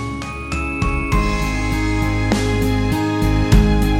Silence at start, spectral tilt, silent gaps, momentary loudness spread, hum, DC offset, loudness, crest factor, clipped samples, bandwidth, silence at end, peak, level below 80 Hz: 0 s; -6 dB/octave; none; 8 LU; none; under 0.1%; -19 LUFS; 16 dB; under 0.1%; 16 kHz; 0 s; -2 dBFS; -22 dBFS